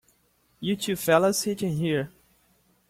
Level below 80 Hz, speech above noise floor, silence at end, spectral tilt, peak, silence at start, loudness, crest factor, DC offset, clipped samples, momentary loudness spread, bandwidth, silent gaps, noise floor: -62 dBFS; 42 dB; 0.8 s; -4.5 dB/octave; -8 dBFS; 0.6 s; -25 LUFS; 20 dB; under 0.1%; under 0.1%; 11 LU; 16.5 kHz; none; -66 dBFS